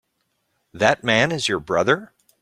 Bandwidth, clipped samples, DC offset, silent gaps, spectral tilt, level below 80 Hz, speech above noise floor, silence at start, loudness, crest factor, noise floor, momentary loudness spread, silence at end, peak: 15.5 kHz; under 0.1%; under 0.1%; none; -4 dB/octave; -56 dBFS; 52 dB; 0.75 s; -20 LUFS; 20 dB; -72 dBFS; 5 LU; 0.35 s; -2 dBFS